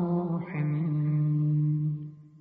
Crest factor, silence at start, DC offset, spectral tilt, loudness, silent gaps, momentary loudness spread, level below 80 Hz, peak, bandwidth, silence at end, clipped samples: 8 dB; 0 s; under 0.1%; -11.5 dB/octave; -28 LUFS; none; 7 LU; -66 dBFS; -20 dBFS; 2.6 kHz; 0.05 s; under 0.1%